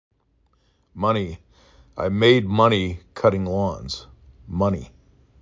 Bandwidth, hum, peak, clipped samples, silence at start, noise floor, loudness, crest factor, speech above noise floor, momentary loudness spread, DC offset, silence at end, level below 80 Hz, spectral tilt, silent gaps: 7.6 kHz; none; -2 dBFS; under 0.1%; 0.95 s; -64 dBFS; -22 LUFS; 20 dB; 44 dB; 16 LU; under 0.1%; 0.55 s; -44 dBFS; -6.5 dB/octave; none